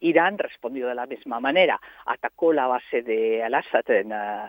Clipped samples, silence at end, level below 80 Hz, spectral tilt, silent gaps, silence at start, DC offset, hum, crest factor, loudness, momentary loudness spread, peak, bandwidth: under 0.1%; 0 s; -72 dBFS; -7 dB/octave; none; 0 s; under 0.1%; none; 20 dB; -24 LUFS; 10 LU; -4 dBFS; 16.5 kHz